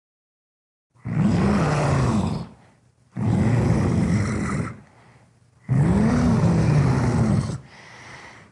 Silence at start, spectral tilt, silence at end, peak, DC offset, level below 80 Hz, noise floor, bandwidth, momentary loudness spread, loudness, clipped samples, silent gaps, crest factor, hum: 1.05 s; -7.5 dB/octave; 0.2 s; -8 dBFS; under 0.1%; -38 dBFS; -57 dBFS; 11.5 kHz; 20 LU; -21 LUFS; under 0.1%; none; 14 dB; none